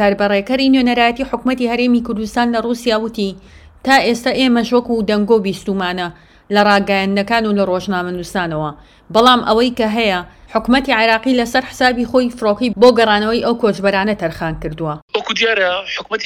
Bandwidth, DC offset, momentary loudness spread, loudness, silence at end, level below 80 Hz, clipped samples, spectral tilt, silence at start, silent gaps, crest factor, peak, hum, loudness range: 15 kHz; under 0.1%; 9 LU; -15 LUFS; 0 s; -42 dBFS; 0.1%; -5 dB/octave; 0 s; 15.02-15.08 s; 16 dB; 0 dBFS; none; 3 LU